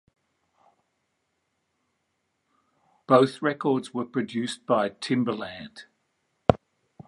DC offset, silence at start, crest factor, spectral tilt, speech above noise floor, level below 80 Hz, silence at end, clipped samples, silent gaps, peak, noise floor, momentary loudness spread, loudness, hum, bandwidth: under 0.1%; 3.1 s; 28 dB; -6 dB/octave; 51 dB; -54 dBFS; 0.5 s; under 0.1%; none; 0 dBFS; -76 dBFS; 13 LU; -26 LUFS; none; 11.5 kHz